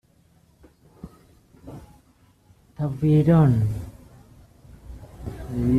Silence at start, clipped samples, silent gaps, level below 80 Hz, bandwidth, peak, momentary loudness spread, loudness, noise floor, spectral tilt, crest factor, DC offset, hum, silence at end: 1.05 s; under 0.1%; none; -44 dBFS; 10 kHz; -8 dBFS; 28 LU; -21 LUFS; -59 dBFS; -10 dB/octave; 18 dB; under 0.1%; none; 0 s